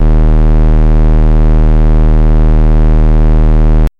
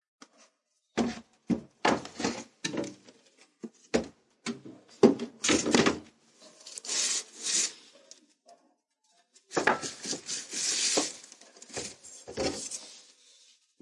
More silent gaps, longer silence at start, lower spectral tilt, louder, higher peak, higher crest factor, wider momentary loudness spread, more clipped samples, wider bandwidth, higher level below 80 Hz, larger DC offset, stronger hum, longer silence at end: neither; second, 0 s vs 0.95 s; first, -10 dB/octave vs -2.5 dB/octave; first, -10 LUFS vs -30 LUFS; about the same, -4 dBFS vs -6 dBFS; second, 2 dB vs 28 dB; second, 0 LU vs 22 LU; neither; second, 3.2 kHz vs 11.5 kHz; first, -6 dBFS vs -66 dBFS; neither; neither; second, 0.1 s vs 0.8 s